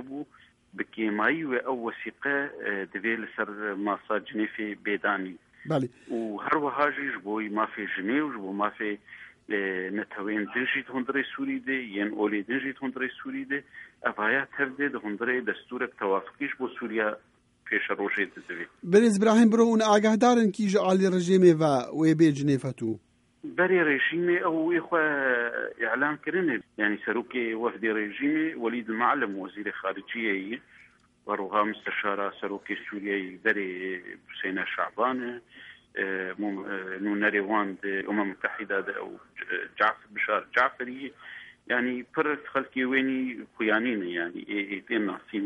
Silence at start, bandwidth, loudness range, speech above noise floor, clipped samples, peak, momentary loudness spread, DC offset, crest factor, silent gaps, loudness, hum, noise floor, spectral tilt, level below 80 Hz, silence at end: 0 s; 11.5 kHz; 8 LU; 31 dB; under 0.1%; -8 dBFS; 13 LU; under 0.1%; 20 dB; none; -28 LUFS; none; -58 dBFS; -5.5 dB/octave; -74 dBFS; 0 s